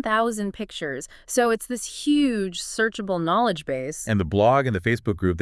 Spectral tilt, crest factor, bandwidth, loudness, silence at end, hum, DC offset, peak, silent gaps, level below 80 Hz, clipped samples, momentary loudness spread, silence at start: -5 dB/octave; 16 dB; 12 kHz; -24 LUFS; 0 s; none; under 0.1%; -8 dBFS; none; -50 dBFS; under 0.1%; 11 LU; 0.05 s